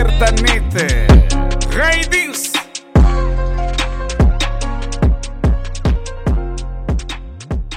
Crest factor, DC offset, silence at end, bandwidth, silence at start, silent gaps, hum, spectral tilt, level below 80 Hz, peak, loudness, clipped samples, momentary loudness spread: 14 dB; under 0.1%; 0 s; 15.5 kHz; 0 s; none; none; -4.5 dB/octave; -16 dBFS; 0 dBFS; -16 LUFS; under 0.1%; 11 LU